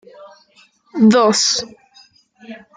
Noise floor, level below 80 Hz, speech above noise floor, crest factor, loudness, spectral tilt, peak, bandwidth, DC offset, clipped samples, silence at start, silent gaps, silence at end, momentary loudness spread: -53 dBFS; -62 dBFS; 39 dB; 16 dB; -14 LUFS; -3.5 dB/octave; -2 dBFS; 9.6 kHz; under 0.1%; under 0.1%; 0.2 s; none; 0.2 s; 25 LU